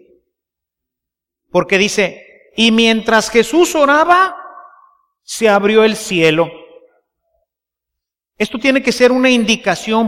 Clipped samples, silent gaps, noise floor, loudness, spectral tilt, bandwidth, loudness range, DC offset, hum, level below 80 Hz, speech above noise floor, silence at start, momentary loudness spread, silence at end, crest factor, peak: under 0.1%; none; -83 dBFS; -13 LUFS; -3.5 dB/octave; 16 kHz; 4 LU; under 0.1%; none; -50 dBFS; 70 dB; 1.55 s; 9 LU; 0 s; 14 dB; 0 dBFS